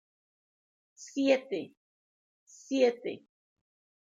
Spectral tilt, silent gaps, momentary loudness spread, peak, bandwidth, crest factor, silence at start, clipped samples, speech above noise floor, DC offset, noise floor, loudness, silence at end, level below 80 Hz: -4 dB/octave; 1.77-2.47 s; 20 LU; -12 dBFS; 7.8 kHz; 22 dB; 1 s; under 0.1%; over 60 dB; under 0.1%; under -90 dBFS; -31 LUFS; 0.9 s; -90 dBFS